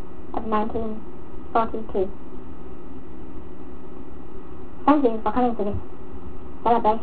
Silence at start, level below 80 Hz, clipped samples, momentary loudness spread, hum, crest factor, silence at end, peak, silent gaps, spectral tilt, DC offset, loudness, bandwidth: 0 s; -44 dBFS; under 0.1%; 21 LU; none; 22 dB; 0 s; -2 dBFS; none; -10.5 dB/octave; 7%; -24 LUFS; 4 kHz